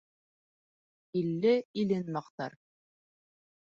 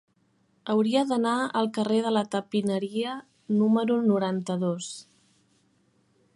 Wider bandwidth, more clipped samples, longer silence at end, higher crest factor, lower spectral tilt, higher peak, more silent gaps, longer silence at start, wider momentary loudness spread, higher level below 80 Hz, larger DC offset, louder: second, 7.4 kHz vs 11.5 kHz; neither; second, 1.2 s vs 1.35 s; about the same, 18 dB vs 16 dB; first, -8 dB/octave vs -6 dB/octave; second, -16 dBFS vs -12 dBFS; first, 1.65-1.74 s, 2.30-2.38 s vs none; first, 1.15 s vs 0.65 s; first, 14 LU vs 11 LU; about the same, -78 dBFS vs -76 dBFS; neither; second, -32 LUFS vs -26 LUFS